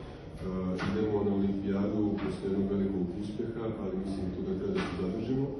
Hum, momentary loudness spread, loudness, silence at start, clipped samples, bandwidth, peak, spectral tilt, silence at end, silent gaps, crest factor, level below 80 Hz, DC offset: none; 6 LU; -33 LUFS; 0 s; under 0.1%; 10 kHz; -18 dBFS; -8.5 dB/octave; 0 s; none; 14 dB; -50 dBFS; under 0.1%